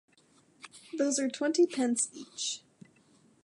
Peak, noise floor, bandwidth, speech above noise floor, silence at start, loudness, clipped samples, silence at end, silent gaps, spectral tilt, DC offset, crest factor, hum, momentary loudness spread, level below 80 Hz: -16 dBFS; -65 dBFS; 11.5 kHz; 35 dB; 0.65 s; -30 LUFS; under 0.1%; 0.85 s; none; -2 dB/octave; under 0.1%; 18 dB; none; 22 LU; -86 dBFS